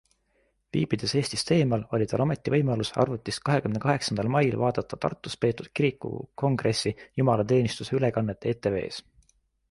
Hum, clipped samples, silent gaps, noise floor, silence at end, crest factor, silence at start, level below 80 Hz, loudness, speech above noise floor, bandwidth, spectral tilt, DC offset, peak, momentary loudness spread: none; under 0.1%; none; -70 dBFS; 0.7 s; 18 dB; 0.75 s; -56 dBFS; -27 LUFS; 44 dB; 11.5 kHz; -6 dB/octave; under 0.1%; -8 dBFS; 7 LU